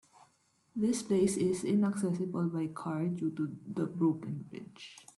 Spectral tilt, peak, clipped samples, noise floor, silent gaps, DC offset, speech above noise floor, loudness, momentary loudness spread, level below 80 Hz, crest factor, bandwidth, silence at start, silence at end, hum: -6.5 dB/octave; -18 dBFS; under 0.1%; -71 dBFS; none; under 0.1%; 38 dB; -33 LUFS; 14 LU; -70 dBFS; 16 dB; 12.5 kHz; 0.75 s; 0.15 s; none